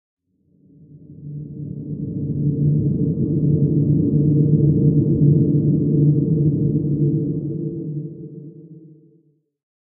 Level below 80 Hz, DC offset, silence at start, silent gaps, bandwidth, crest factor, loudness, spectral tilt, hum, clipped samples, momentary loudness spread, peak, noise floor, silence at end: -44 dBFS; under 0.1%; 0.95 s; none; 0.8 kHz; 16 dB; -18 LUFS; -17.5 dB/octave; none; under 0.1%; 17 LU; -4 dBFS; -59 dBFS; 1.2 s